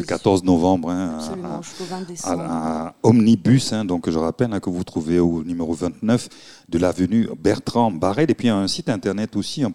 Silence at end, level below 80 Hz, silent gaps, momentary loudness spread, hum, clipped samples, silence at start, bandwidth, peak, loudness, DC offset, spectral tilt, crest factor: 0 s; -48 dBFS; none; 11 LU; none; under 0.1%; 0 s; 12.5 kHz; -2 dBFS; -21 LUFS; 0.3%; -6 dB/octave; 18 dB